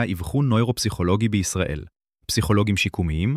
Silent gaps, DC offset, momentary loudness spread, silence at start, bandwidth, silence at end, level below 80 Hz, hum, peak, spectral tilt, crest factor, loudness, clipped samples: none; under 0.1%; 6 LU; 0 s; 15.5 kHz; 0 s; -38 dBFS; none; -6 dBFS; -5.5 dB/octave; 16 dB; -22 LUFS; under 0.1%